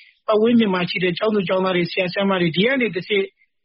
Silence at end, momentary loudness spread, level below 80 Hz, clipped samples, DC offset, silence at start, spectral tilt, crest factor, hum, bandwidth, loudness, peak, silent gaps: 0.35 s; 5 LU; -62 dBFS; under 0.1%; under 0.1%; 0.3 s; -4 dB/octave; 14 dB; none; 5.6 kHz; -19 LUFS; -6 dBFS; none